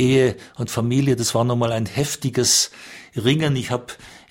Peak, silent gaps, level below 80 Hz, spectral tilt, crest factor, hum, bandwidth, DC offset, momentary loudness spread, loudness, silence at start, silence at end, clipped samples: -4 dBFS; none; -52 dBFS; -4.5 dB/octave; 16 dB; none; 16.5 kHz; under 0.1%; 14 LU; -20 LUFS; 0 s; 0.15 s; under 0.1%